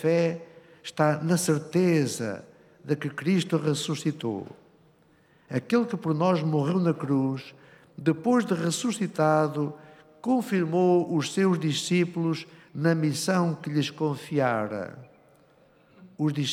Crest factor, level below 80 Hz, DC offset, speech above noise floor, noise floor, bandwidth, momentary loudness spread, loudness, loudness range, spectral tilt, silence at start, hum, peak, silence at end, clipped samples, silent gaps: 16 dB; -76 dBFS; under 0.1%; 35 dB; -61 dBFS; 15 kHz; 11 LU; -26 LUFS; 4 LU; -6 dB/octave; 0 s; none; -10 dBFS; 0 s; under 0.1%; none